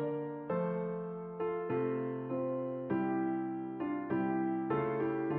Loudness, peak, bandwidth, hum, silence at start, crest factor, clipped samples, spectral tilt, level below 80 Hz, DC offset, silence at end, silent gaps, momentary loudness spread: -36 LUFS; -22 dBFS; 3.8 kHz; none; 0 s; 14 dB; under 0.1%; -8 dB/octave; -72 dBFS; under 0.1%; 0 s; none; 5 LU